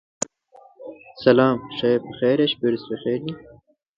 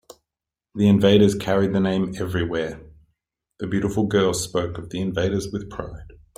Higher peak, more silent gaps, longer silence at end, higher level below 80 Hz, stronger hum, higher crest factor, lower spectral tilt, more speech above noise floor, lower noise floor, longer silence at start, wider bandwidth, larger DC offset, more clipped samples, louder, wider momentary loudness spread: about the same, -2 dBFS vs -2 dBFS; neither; first, 0.6 s vs 0.3 s; second, -60 dBFS vs -48 dBFS; neither; about the same, 20 dB vs 20 dB; about the same, -5 dB/octave vs -6 dB/octave; second, 31 dB vs 67 dB; second, -52 dBFS vs -87 dBFS; about the same, 0.8 s vs 0.75 s; second, 9.6 kHz vs 15.5 kHz; neither; neither; about the same, -21 LUFS vs -22 LUFS; first, 23 LU vs 18 LU